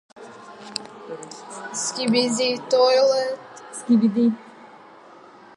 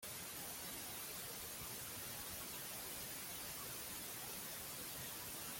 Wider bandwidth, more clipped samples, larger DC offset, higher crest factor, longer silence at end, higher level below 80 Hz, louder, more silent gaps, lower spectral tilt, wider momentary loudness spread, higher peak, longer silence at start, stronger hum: second, 11.5 kHz vs 17 kHz; neither; neither; about the same, 18 dB vs 14 dB; first, 0.9 s vs 0 s; second, -76 dBFS vs -70 dBFS; first, -21 LUFS vs -46 LUFS; neither; first, -4 dB/octave vs -1.5 dB/octave; first, 19 LU vs 1 LU; first, -6 dBFS vs -36 dBFS; first, 0.2 s vs 0 s; neither